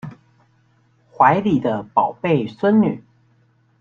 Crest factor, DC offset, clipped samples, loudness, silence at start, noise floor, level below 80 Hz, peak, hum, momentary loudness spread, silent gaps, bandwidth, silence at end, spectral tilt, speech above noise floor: 18 dB; under 0.1%; under 0.1%; -18 LUFS; 0.05 s; -59 dBFS; -58 dBFS; -2 dBFS; none; 7 LU; none; 6.8 kHz; 0.8 s; -9 dB/octave; 41 dB